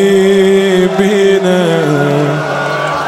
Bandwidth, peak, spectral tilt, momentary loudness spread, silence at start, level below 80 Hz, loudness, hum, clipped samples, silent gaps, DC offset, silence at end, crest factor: 13.5 kHz; 0 dBFS; -6 dB/octave; 6 LU; 0 s; -50 dBFS; -10 LUFS; none; under 0.1%; none; under 0.1%; 0 s; 10 dB